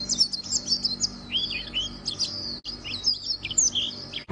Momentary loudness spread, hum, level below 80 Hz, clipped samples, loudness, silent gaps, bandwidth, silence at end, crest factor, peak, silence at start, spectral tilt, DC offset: 10 LU; none; -50 dBFS; under 0.1%; -25 LUFS; none; 10.5 kHz; 0 s; 18 dB; -10 dBFS; 0 s; 0 dB/octave; under 0.1%